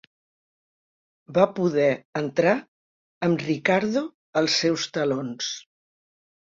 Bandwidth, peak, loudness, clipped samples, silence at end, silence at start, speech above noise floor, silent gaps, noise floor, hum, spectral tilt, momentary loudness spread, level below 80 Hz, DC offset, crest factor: 7.8 kHz; -4 dBFS; -24 LUFS; under 0.1%; 0.9 s; 1.3 s; over 67 dB; 2.05-2.13 s, 2.68-3.21 s, 4.14-4.33 s; under -90 dBFS; none; -4.5 dB/octave; 7 LU; -66 dBFS; under 0.1%; 22 dB